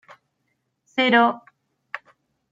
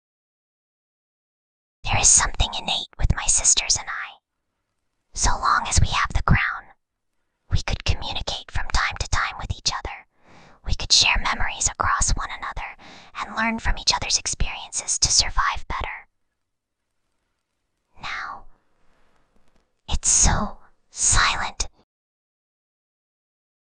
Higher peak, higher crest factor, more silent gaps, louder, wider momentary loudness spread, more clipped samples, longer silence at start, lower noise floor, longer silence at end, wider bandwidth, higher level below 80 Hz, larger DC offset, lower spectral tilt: about the same, -4 dBFS vs -2 dBFS; about the same, 20 dB vs 22 dB; neither; about the same, -19 LUFS vs -21 LUFS; first, 20 LU vs 17 LU; neither; second, 0.95 s vs 1.85 s; second, -74 dBFS vs -79 dBFS; second, 0.55 s vs 2.1 s; second, 7.6 kHz vs 10.5 kHz; second, -78 dBFS vs -30 dBFS; neither; first, -5 dB/octave vs -1.5 dB/octave